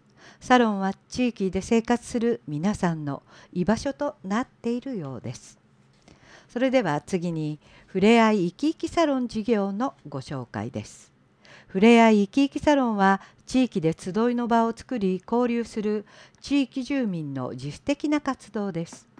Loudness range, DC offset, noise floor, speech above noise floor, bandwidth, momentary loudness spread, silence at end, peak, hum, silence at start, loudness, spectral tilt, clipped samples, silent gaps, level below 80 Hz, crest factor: 8 LU; under 0.1%; -57 dBFS; 33 dB; 10.5 kHz; 14 LU; 0.2 s; -6 dBFS; none; 0.25 s; -25 LUFS; -6 dB/octave; under 0.1%; none; -56 dBFS; 18 dB